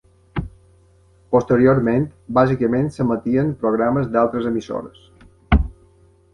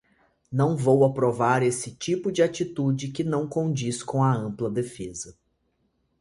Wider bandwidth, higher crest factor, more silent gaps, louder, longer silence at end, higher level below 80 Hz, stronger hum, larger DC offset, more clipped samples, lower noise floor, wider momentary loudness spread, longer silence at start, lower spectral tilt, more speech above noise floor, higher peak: second, 10 kHz vs 11.5 kHz; about the same, 18 dB vs 18 dB; neither; first, -19 LUFS vs -25 LUFS; second, 0.6 s vs 0.9 s; first, -32 dBFS vs -60 dBFS; neither; neither; neither; second, -53 dBFS vs -71 dBFS; first, 15 LU vs 11 LU; second, 0.35 s vs 0.5 s; first, -9 dB/octave vs -6 dB/octave; second, 35 dB vs 47 dB; first, -2 dBFS vs -6 dBFS